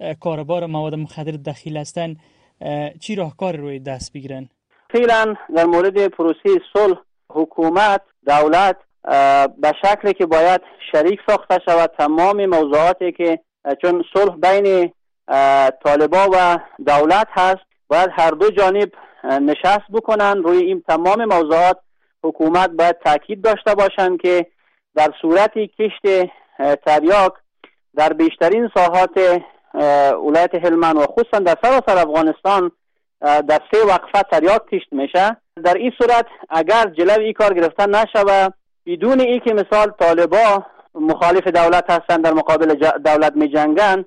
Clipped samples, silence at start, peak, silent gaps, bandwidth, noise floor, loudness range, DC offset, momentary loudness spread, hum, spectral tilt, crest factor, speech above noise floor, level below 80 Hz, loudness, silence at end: under 0.1%; 0 s; -6 dBFS; none; 10.5 kHz; -51 dBFS; 2 LU; under 0.1%; 12 LU; none; -5.5 dB/octave; 10 dB; 36 dB; -50 dBFS; -15 LUFS; 0.05 s